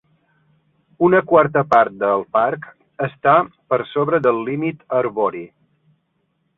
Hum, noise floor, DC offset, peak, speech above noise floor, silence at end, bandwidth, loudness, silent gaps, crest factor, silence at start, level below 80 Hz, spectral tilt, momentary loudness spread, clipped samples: none; -68 dBFS; under 0.1%; -2 dBFS; 51 dB; 1.1 s; 7 kHz; -18 LUFS; none; 18 dB; 1 s; -60 dBFS; -8.5 dB/octave; 10 LU; under 0.1%